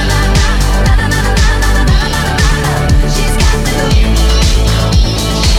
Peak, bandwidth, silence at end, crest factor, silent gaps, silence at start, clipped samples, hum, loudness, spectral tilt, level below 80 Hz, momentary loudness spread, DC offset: 0 dBFS; 15.5 kHz; 0 s; 8 dB; none; 0 s; under 0.1%; none; -11 LUFS; -4.5 dB/octave; -12 dBFS; 2 LU; under 0.1%